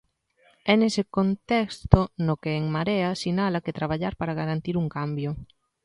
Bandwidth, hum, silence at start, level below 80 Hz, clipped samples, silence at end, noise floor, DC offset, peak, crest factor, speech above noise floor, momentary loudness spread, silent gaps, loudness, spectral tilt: 11.5 kHz; none; 0.65 s; -40 dBFS; under 0.1%; 0.4 s; -63 dBFS; under 0.1%; 0 dBFS; 26 dB; 39 dB; 8 LU; none; -25 LUFS; -7 dB/octave